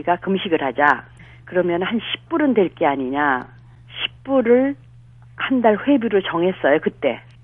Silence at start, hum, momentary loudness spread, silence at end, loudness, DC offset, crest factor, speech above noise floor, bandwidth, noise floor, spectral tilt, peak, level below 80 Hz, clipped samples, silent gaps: 0 s; none; 9 LU; 0.25 s; -19 LUFS; under 0.1%; 20 dB; 26 dB; 4.4 kHz; -45 dBFS; -8 dB/octave; 0 dBFS; -54 dBFS; under 0.1%; none